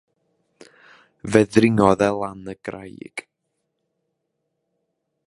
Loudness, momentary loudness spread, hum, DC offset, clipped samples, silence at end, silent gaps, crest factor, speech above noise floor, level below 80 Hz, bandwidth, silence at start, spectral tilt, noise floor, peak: -18 LUFS; 20 LU; none; under 0.1%; under 0.1%; 2.1 s; none; 24 dB; 57 dB; -52 dBFS; 11.5 kHz; 1.25 s; -6.5 dB/octave; -76 dBFS; 0 dBFS